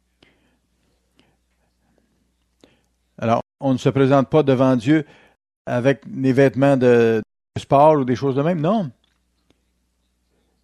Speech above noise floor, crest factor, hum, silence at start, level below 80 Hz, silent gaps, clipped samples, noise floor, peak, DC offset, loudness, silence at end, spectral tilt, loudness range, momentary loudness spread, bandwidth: 51 dB; 18 dB; none; 3.2 s; -58 dBFS; 5.56-5.65 s; under 0.1%; -68 dBFS; -2 dBFS; under 0.1%; -18 LUFS; 1.75 s; -8 dB/octave; 8 LU; 12 LU; 10.5 kHz